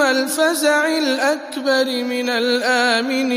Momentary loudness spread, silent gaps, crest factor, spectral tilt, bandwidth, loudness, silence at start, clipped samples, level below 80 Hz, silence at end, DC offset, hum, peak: 4 LU; none; 14 dB; -1 dB/octave; 15.5 kHz; -17 LUFS; 0 s; under 0.1%; -76 dBFS; 0 s; under 0.1%; none; -2 dBFS